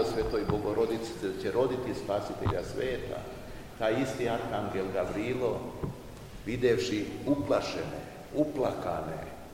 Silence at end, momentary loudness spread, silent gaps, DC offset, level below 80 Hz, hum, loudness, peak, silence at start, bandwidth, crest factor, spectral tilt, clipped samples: 0 s; 11 LU; none; 0.1%; -50 dBFS; none; -32 LUFS; -14 dBFS; 0 s; 16 kHz; 18 dB; -6 dB/octave; under 0.1%